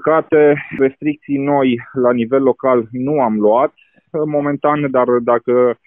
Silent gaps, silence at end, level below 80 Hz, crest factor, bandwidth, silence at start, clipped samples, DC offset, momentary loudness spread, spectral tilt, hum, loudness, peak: none; 0.15 s; -58 dBFS; 12 dB; 3.7 kHz; 0 s; under 0.1%; under 0.1%; 6 LU; -11.5 dB/octave; none; -15 LUFS; -2 dBFS